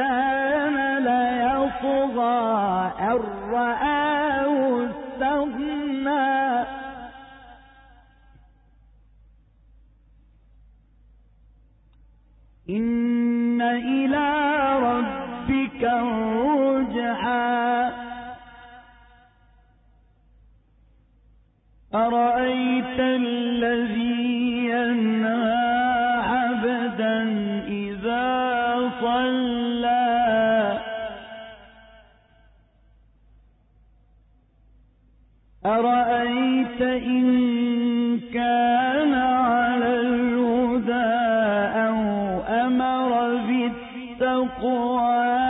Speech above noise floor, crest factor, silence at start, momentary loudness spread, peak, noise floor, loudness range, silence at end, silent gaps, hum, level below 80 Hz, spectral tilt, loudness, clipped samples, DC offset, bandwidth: 35 dB; 12 dB; 0 s; 7 LU; -12 dBFS; -57 dBFS; 7 LU; 0 s; none; none; -52 dBFS; -10 dB/octave; -22 LUFS; under 0.1%; under 0.1%; 4 kHz